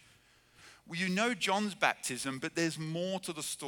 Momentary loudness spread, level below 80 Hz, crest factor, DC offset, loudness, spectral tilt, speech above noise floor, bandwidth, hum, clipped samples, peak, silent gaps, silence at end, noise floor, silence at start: 7 LU; -76 dBFS; 24 dB; under 0.1%; -33 LUFS; -3.5 dB/octave; 30 dB; 19.5 kHz; none; under 0.1%; -12 dBFS; none; 0 s; -65 dBFS; 0.6 s